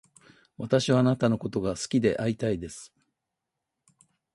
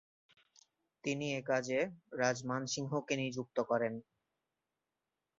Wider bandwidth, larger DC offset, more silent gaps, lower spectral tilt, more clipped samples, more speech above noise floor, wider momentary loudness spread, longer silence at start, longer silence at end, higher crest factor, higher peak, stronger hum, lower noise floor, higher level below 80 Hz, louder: first, 11.5 kHz vs 7.6 kHz; neither; neither; first, -6 dB/octave vs -4 dB/octave; neither; first, 59 dB vs 53 dB; first, 15 LU vs 6 LU; second, 0.6 s vs 1.05 s; about the same, 1.5 s vs 1.4 s; about the same, 20 dB vs 22 dB; first, -10 dBFS vs -16 dBFS; neither; second, -85 dBFS vs -90 dBFS; first, -56 dBFS vs -78 dBFS; first, -26 LUFS vs -37 LUFS